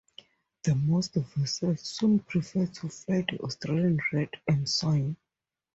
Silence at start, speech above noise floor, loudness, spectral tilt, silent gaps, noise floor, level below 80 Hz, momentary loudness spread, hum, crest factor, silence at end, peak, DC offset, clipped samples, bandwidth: 0.65 s; 60 dB; -29 LUFS; -6 dB/octave; none; -88 dBFS; -60 dBFS; 7 LU; none; 18 dB; 0.6 s; -12 dBFS; under 0.1%; under 0.1%; 8 kHz